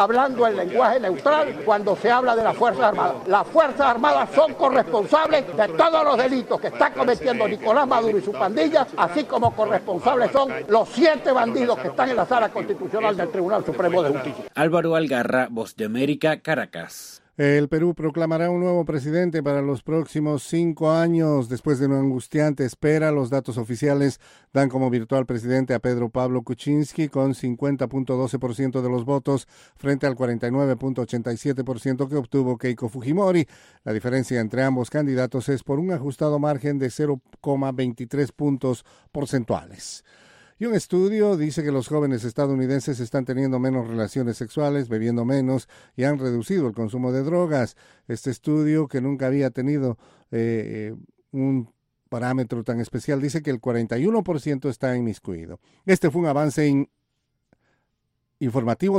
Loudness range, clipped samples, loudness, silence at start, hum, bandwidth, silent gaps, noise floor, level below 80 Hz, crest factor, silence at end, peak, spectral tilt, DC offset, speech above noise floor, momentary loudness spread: 6 LU; under 0.1%; -22 LUFS; 0 s; none; 15.5 kHz; none; -75 dBFS; -58 dBFS; 18 dB; 0 s; -4 dBFS; -7 dB/octave; under 0.1%; 53 dB; 9 LU